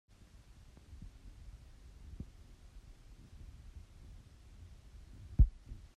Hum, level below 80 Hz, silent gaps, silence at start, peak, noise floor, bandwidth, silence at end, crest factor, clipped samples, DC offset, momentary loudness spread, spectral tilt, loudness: none; -42 dBFS; none; 0.2 s; -14 dBFS; -59 dBFS; 7.2 kHz; 0.1 s; 26 dB; under 0.1%; under 0.1%; 27 LU; -8 dB/octave; -37 LUFS